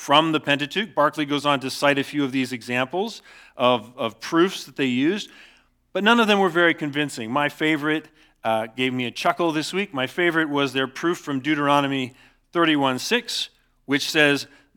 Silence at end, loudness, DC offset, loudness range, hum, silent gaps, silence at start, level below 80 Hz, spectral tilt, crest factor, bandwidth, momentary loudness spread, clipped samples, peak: 0.3 s; -22 LUFS; under 0.1%; 3 LU; none; none; 0 s; -68 dBFS; -4.5 dB/octave; 20 dB; 18.5 kHz; 9 LU; under 0.1%; -2 dBFS